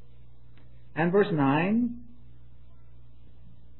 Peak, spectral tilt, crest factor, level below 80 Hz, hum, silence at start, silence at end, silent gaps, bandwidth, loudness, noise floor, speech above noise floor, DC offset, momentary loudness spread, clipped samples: -12 dBFS; -11 dB/octave; 18 dB; -56 dBFS; none; 0.95 s; 1.75 s; none; 4.2 kHz; -26 LUFS; -55 dBFS; 30 dB; 0.9%; 13 LU; under 0.1%